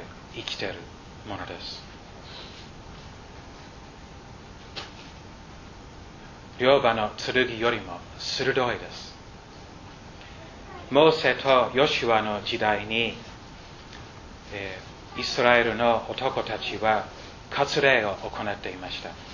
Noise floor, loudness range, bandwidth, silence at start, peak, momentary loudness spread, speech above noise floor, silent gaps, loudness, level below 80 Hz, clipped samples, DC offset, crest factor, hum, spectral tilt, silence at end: -45 dBFS; 19 LU; 7.4 kHz; 0 s; -2 dBFS; 24 LU; 20 dB; none; -25 LUFS; -50 dBFS; under 0.1%; under 0.1%; 26 dB; none; -4.5 dB/octave; 0 s